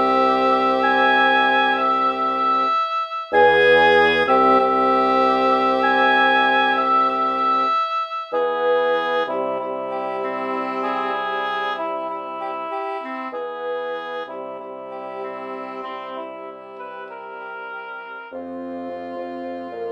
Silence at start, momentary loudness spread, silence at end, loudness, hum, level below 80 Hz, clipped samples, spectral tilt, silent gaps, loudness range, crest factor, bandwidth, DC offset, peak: 0 s; 17 LU; 0 s; -19 LUFS; none; -58 dBFS; under 0.1%; -4.5 dB/octave; none; 16 LU; 16 dB; 8.8 kHz; under 0.1%; -4 dBFS